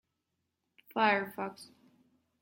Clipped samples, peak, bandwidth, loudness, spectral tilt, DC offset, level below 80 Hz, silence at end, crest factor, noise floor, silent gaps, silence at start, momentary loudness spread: under 0.1%; -14 dBFS; 16.5 kHz; -32 LUFS; -5 dB/octave; under 0.1%; -84 dBFS; 0.75 s; 24 dB; -84 dBFS; none; 0.95 s; 15 LU